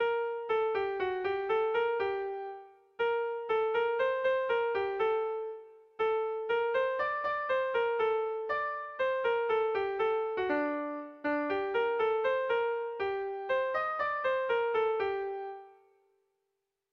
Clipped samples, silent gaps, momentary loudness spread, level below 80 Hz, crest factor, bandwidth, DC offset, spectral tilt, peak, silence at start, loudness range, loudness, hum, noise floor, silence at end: under 0.1%; none; 7 LU; -70 dBFS; 12 dB; 5.6 kHz; under 0.1%; -5.5 dB/octave; -20 dBFS; 0 s; 1 LU; -32 LUFS; none; -84 dBFS; 1.2 s